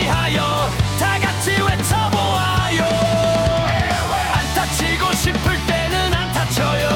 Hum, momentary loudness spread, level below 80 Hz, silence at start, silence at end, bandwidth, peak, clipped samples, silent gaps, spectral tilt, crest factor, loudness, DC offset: none; 2 LU; -30 dBFS; 0 s; 0 s; 18 kHz; -6 dBFS; under 0.1%; none; -4.5 dB/octave; 12 dB; -18 LUFS; under 0.1%